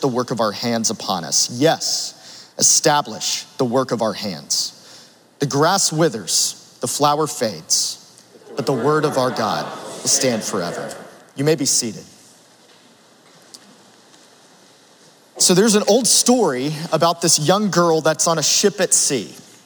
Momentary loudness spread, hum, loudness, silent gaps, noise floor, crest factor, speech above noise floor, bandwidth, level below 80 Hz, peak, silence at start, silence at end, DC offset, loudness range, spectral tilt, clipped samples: 13 LU; none; -17 LUFS; none; -50 dBFS; 20 dB; 32 dB; over 20 kHz; -72 dBFS; 0 dBFS; 0 s; 0.25 s; under 0.1%; 8 LU; -3 dB/octave; under 0.1%